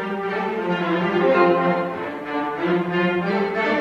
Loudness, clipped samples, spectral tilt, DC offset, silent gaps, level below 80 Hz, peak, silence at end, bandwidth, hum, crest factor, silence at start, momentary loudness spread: -21 LUFS; under 0.1%; -7.5 dB/octave; under 0.1%; none; -60 dBFS; -4 dBFS; 0 s; 7.4 kHz; none; 18 dB; 0 s; 9 LU